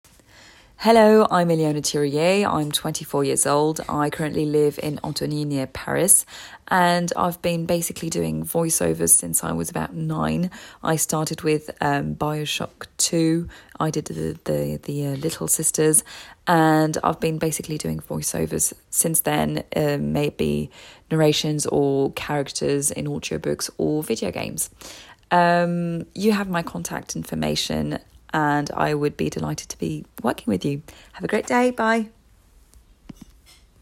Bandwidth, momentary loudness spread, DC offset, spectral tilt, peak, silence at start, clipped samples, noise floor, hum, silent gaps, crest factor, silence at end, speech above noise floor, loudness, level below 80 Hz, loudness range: 16.5 kHz; 11 LU; under 0.1%; -4 dB/octave; -2 dBFS; 0.8 s; under 0.1%; -54 dBFS; none; none; 22 dB; 1.75 s; 32 dB; -22 LUFS; -52 dBFS; 4 LU